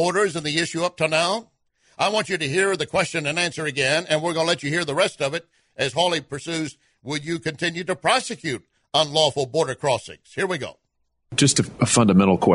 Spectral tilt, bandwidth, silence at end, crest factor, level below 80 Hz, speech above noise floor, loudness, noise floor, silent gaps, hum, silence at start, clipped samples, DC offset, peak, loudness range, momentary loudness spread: -4 dB/octave; 11 kHz; 0 s; 18 dB; -58 dBFS; 47 dB; -22 LUFS; -69 dBFS; none; none; 0 s; under 0.1%; under 0.1%; -6 dBFS; 3 LU; 11 LU